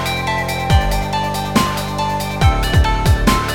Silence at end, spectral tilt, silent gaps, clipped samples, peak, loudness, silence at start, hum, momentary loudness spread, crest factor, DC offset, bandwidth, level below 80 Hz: 0 s; -5 dB/octave; none; under 0.1%; 0 dBFS; -17 LUFS; 0 s; none; 5 LU; 16 dB; under 0.1%; 18.5 kHz; -20 dBFS